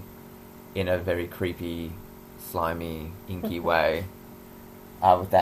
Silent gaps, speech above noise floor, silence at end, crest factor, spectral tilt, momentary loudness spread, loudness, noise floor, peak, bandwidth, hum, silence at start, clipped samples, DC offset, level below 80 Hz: none; 20 dB; 0 s; 24 dB; -6 dB/octave; 23 LU; -27 LUFS; -46 dBFS; -4 dBFS; 16 kHz; none; 0 s; under 0.1%; under 0.1%; -50 dBFS